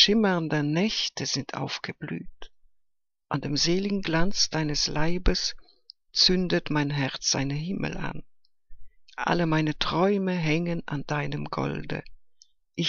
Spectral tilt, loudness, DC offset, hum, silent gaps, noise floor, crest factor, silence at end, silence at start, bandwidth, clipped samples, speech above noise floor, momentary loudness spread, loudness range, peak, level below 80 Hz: -4 dB/octave; -26 LUFS; under 0.1%; none; none; -74 dBFS; 22 dB; 0 s; 0 s; 7.4 kHz; under 0.1%; 48 dB; 11 LU; 4 LU; -4 dBFS; -40 dBFS